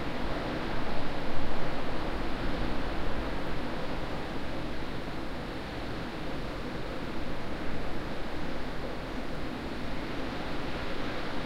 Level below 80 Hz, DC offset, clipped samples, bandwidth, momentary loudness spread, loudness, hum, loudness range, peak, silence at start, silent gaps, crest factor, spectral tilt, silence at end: -40 dBFS; under 0.1%; under 0.1%; 9.4 kHz; 3 LU; -36 LUFS; none; 3 LU; -12 dBFS; 0 s; none; 16 dB; -6 dB/octave; 0 s